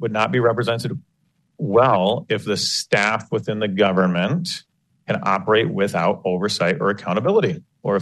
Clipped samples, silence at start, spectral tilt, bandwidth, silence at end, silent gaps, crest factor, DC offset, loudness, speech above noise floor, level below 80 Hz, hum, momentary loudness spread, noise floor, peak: under 0.1%; 0 s; -5 dB/octave; 12.5 kHz; 0 s; none; 16 dB; under 0.1%; -20 LUFS; 46 dB; -62 dBFS; none; 9 LU; -66 dBFS; -4 dBFS